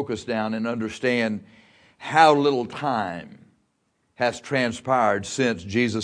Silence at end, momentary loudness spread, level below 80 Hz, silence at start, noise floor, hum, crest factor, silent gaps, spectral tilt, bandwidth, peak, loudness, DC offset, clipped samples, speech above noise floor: 0 s; 11 LU; -62 dBFS; 0 s; -71 dBFS; none; 22 dB; none; -5 dB/octave; 10.5 kHz; -2 dBFS; -23 LUFS; under 0.1%; under 0.1%; 48 dB